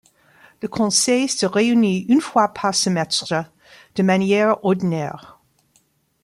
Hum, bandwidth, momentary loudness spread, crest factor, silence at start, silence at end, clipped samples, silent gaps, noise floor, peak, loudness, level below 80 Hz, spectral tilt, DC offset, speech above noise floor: none; 13 kHz; 13 LU; 16 dB; 0.65 s; 0.95 s; under 0.1%; none; -62 dBFS; -4 dBFS; -19 LUFS; -62 dBFS; -4 dB/octave; under 0.1%; 44 dB